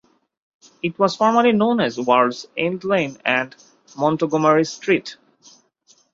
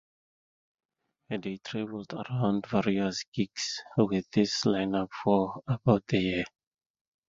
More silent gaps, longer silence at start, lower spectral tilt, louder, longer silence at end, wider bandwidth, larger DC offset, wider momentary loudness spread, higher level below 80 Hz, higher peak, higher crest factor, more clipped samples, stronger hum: second, none vs 3.28-3.32 s; second, 0.85 s vs 1.3 s; about the same, -5.5 dB/octave vs -5.5 dB/octave; first, -19 LUFS vs -29 LUFS; first, 1 s vs 0.8 s; about the same, 7.8 kHz vs 7.8 kHz; neither; about the same, 8 LU vs 10 LU; about the same, -64 dBFS vs -60 dBFS; first, -2 dBFS vs -8 dBFS; about the same, 20 dB vs 22 dB; neither; neither